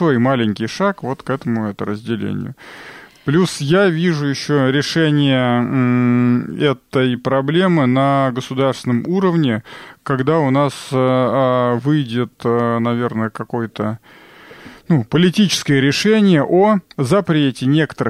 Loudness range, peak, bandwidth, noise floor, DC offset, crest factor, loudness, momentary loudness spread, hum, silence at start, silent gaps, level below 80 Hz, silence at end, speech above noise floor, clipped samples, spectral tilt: 5 LU; -4 dBFS; 14.5 kHz; -39 dBFS; under 0.1%; 12 dB; -16 LUFS; 10 LU; none; 0 s; none; -56 dBFS; 0 s; 24 dB; under 0.1%; -6.5 dB/octave